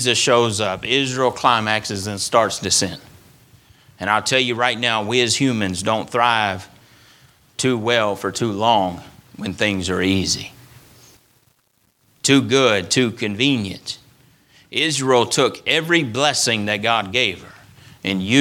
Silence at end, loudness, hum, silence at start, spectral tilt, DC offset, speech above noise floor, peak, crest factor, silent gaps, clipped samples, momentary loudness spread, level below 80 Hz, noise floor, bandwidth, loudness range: 0 s; -18 LUFS; none; 0 s; -3.5 dB/octave; under 0.1%; 44 dB; 0 dBFS; 20 dB; none; under 0.1%; 10 LU; -56 dBFS; -63 dBFS; 18.5 kHz; 3 LU